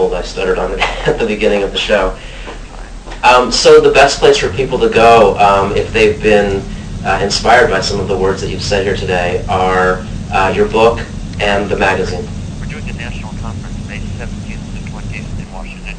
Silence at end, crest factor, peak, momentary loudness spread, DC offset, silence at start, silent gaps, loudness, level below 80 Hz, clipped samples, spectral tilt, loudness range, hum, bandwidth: 0 s; 12 dB; 0 dBFS; 18 LU; under 0.1%; 0 s; none; -12 LUFS; -28 dBFS; 0.9%; -4.5 dB/octave; 11 LU; none; 11 kHz